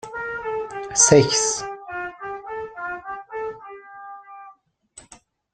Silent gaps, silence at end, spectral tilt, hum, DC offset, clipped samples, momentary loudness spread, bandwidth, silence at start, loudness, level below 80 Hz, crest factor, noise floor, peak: none; 0.4 s; -3 dB/octave; none; under 0.1%; under 0.1%; 26 LU; 10.5 kHz; 0.05 s; -21 LUFS; -58 dBFS; 24 dB; -52 dBFS; -2 dBFS